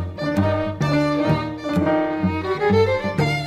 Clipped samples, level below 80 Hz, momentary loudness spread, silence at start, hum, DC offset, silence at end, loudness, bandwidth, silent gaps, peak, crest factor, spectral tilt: under 0.1%; -44 dBFS; 5 LU; 0 s; none; under 0.1%; 0 s; -21 LUFS; 15 kHz; none; -6 dBFS; 14 dB; -7.5 dB/octave